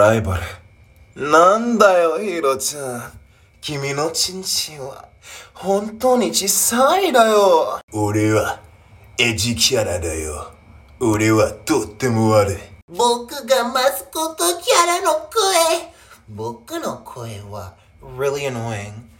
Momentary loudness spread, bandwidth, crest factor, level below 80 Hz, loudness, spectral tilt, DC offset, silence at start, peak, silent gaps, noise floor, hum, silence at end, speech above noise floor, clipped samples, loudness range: 18 LU; 17 kHz; 18 dB; -46 dBFS; -18 LUFS; -3.5 dB/octave; under 0.1%; 0 s; -2 dBFS; 7.83-7.88 s, 12.82-12.88 s; -48 dBFS; none; 0.15 s; 30 dB; under 0.1%; 6 LU